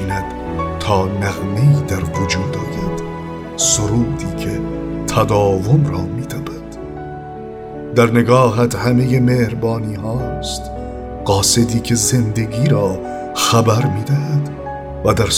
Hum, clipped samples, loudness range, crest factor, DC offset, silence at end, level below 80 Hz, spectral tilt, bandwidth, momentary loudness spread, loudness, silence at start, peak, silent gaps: none; under 0.1%; 3 LU; 16 dB; under 0.1%; 0 s; -34 dBFS; -5 dB/octave; 16.5 kHz; 14 LU; -17 LUFS; 0 s; 0 dBFS; none